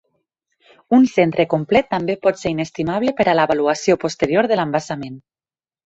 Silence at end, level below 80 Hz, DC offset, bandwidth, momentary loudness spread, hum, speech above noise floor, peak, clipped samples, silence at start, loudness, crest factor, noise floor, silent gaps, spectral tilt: 0.65 s; -54 dBFS; under 0.1%; 8 kHz; 8 LU; none; over 73 dB; -2 dBFS; under 0.1%; 0.9 s; -18 LUFS; 16 dB; under -90 dBFS; none; -6 dB/octave